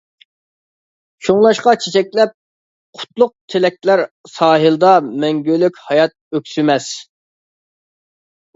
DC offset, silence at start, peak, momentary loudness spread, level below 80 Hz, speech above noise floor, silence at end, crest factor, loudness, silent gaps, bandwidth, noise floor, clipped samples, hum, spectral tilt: under 0.1%; 1.2 s; 0 dBFS; 13 LU; -64 dBFS; over 76 dB; 1.55 s; 16 dB; -15 LUFS; 2.34-2.93 s, 3.41-3.48 s, 4.11-4.24 s, 6.21-6.31 s; 8 kHz; under -90 dBFS; under 0.1%; none; -5 dB/octave